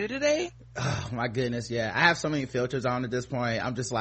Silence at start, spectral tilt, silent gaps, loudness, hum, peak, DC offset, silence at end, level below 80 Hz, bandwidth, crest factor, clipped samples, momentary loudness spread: 0 s; -5 dB/octave; none; -28 LUFS; none; -6 dBFS; under 0.1%; 0 s; -54 dBFS; 8.4 kHz; 24 dB; under 0.1%; 8 LU